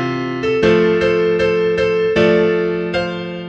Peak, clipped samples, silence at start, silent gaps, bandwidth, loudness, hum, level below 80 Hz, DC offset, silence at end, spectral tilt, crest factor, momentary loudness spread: 0 dBFS; under 0.1%; 0 s; none; 7.8 kHz; -15 LUFS; none; -42 dBFS; under 0.1%; 0 s; -6.5 dB/octave; 14 dB; 7 LU